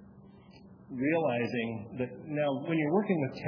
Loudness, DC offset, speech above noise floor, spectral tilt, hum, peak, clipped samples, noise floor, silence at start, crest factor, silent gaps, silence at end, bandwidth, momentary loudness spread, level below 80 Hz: -31 LUFS; under 0.1%; 23 dB; -9 dB/octave; none; -14 dBFS; under 0.1%; -54 dBFS; 0 s; 18 dB; none; 0 s; 5.4 kHz; 9 LU; -70 dBFS